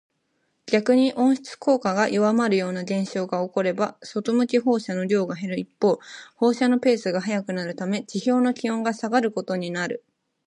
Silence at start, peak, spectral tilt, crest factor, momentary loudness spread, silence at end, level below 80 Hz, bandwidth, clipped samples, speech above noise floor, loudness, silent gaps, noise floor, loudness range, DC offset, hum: 0.65 s; -4 dBFS; -6 dB/octave; 20 dB; 8 LU; 0.5 s; -74 dBFS; 10.5 kHz; under 0.1%; 49 dB; -23 LUFS; none; -72 dBFS; 2 LU; under 0.1%; none